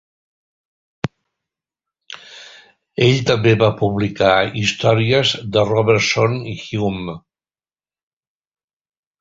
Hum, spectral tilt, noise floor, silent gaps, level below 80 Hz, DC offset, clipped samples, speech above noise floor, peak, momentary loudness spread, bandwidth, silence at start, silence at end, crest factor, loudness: none; -5.5 dB/octave; under -90 dBFS; none; -48 dBFS; under 0.1%; under 0.1%; over 74 dB; -2 dBFS; 18 LU; 7.8 kHz; 1.05 s; 2.05 s; 18 dB; -16 LUFS